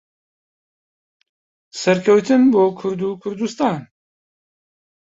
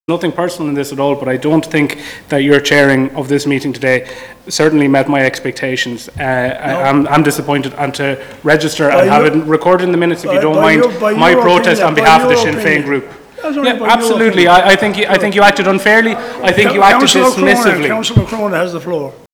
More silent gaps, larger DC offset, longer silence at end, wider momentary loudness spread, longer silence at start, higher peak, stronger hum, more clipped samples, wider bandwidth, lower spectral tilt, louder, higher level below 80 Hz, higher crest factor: neither; neither; first, 1.2 s vs 0.2 s; about the same, 12 LU vs 10 LU; first, 1.75 s vs 0.1 s; about the same, -2 dBFS vs 0 dBFS; neither; second, under 0.1% vs 1%; second, 8 kHz vs over 20 kHz; first, -6 dB/octave vs -4.5 dB/octave; second, -17 LUFS vs -11 LUFS; second, -64 dBFS vs -42 dBFS; first, 18 dB vs 12 dB